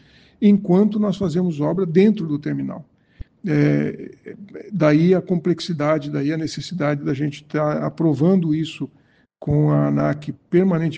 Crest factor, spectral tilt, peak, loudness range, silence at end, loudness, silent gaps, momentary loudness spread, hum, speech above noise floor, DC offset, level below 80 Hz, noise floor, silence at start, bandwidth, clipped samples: 16 dB; -8 dB/octave; -2 dBFS; 2 LU; 0 s; -20 LUFS; none; 14 LU; none; 21 dB; under 0.1%; -50 dBFS; -40 dBFS; 0.4 s; 8.4 kHz; under 0.1%